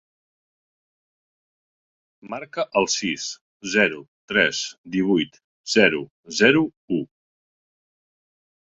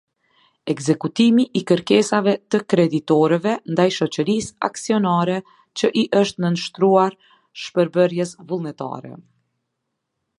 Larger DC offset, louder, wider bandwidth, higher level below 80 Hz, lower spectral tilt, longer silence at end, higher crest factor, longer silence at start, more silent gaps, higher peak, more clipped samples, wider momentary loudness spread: neither; second, -22 LUFS vs -19 LUFS; second, 8.2 kHz vs 11.5 kHz; about the same, -62 dBFS vs -64 dBFS; second, -3.5 dB/octave vs -5.5 dB/octave; first, 1.7 s vs 1.2 s; first, 24 dB vs 18 dB; first, 2.25 s vs 0.65 s; first, 3.41-3.60 s, 4.08-4.28 s, 4.78-4.84 s, 5.44-5.64 s, 6.10-6.23 s, 6.77-6.88 s vs none; about the same, -2 dBFS vs -2 dBFS; neither; first, 17 LU vs 11 LU